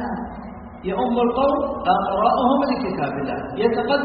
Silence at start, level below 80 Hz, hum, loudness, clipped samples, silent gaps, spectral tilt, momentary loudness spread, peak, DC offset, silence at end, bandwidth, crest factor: 0 s; -44 dBFS; none; -21 LUFS; under 0.1%; none; -4.5 dB/octave; 13 LU; -4 dBFS; under 0.1%; 0 s; 5 kHz; 16 dB